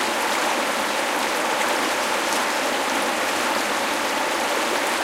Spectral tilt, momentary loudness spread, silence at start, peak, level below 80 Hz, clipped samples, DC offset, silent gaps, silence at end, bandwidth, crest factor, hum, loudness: -1 dB/octave; 1 LU; 0 s; -8 dBFS; -62 dBFS; under 0.1%; under 0.1%; none; 0 s; 17 kHz; 14 dB; none; -21 LUFS